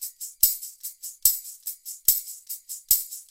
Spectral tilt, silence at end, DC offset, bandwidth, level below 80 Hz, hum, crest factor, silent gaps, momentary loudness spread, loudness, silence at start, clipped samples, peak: 3 dB/octave; 0.05 s; under 0.1%; 17 kHz; -56 dBFS; none; 28 dB; none; 14 LU; -22 LUFS; 0 s; under 0.1%; 0 dBFS